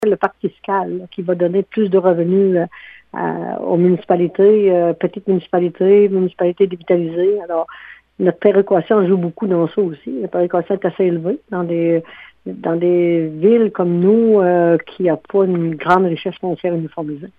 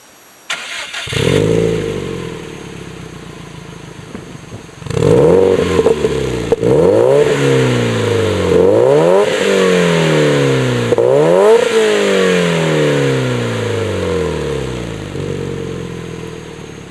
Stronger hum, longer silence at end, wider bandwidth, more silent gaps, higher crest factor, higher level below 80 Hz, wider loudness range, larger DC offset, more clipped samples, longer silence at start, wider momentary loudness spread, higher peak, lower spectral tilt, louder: neither; about the same, 0.1 s vs 0 s; second, 4.2 kHz vs 12 kHz; neither; about the same, 16 dB vs 14 dB; second, -62 dBFS vs -38 dBFS; second, 3 LU vs 9 LU; neither; neither; second, 0 s vs 0.5 s; second, 10 LU vs 21 LU; about the same, 0 dBFS vs 0 dBFS; first, -10 dB/octave vs -5.5 dB/octave; second, -16 LUFS vs -13 LUFS